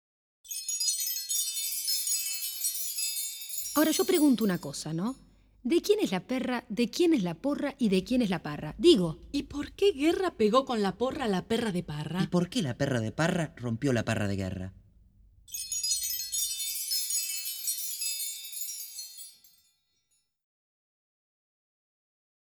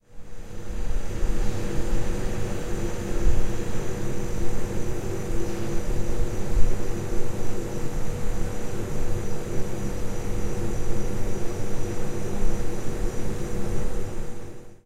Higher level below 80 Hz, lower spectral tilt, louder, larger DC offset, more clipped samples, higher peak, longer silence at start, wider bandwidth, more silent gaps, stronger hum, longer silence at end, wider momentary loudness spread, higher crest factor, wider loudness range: second, -58 dBFS vs -28 dBFS; second, -4 dB/octave vs -6 dB/octave; about the same, -29 LUFS vs -31 LUFS; neither; neither; second, -10 dBFS vs -4 dBFS; first, 0.45 s vs 0.15 s; first, 19.5 kHz vs 12.5 kHz; neither; neither; first, 3.15 s vs 0.1 s; first, 10 LU vs 4 LU; first, 22 dB vs 16 dB; first, 6 LU vs 2 LU